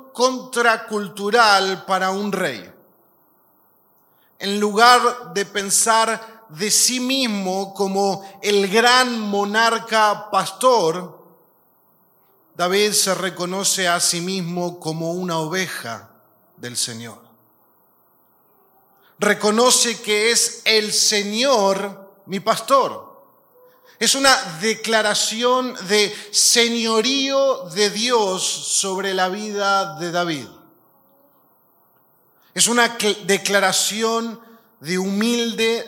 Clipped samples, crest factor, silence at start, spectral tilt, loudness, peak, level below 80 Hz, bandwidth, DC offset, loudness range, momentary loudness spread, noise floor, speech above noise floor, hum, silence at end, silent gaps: under 0.1%; 20 dB; 0.15 s; -2 dB/octave; -18 LUFS; 0 dBFS; -70 dBFS; 17 kHz; under 0.1%; 8 LU; 11 LU; -58 dBFS; 39 dB; none; 0 s; none